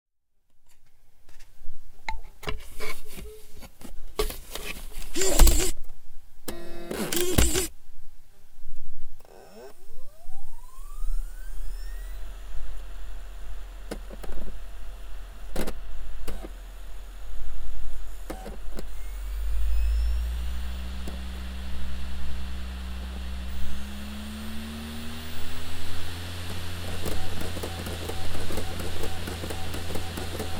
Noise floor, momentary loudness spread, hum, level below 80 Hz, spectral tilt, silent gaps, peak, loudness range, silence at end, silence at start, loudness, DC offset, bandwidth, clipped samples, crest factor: -59 dBFS; 19 LU; none; -32 dBFS; -4 dB/octave; none; -2 dBFS; 14 LU; 0 s; 0.55 s; -33 LUFS; under 0.1%; 17 kHz; under 0.1%; 22 dB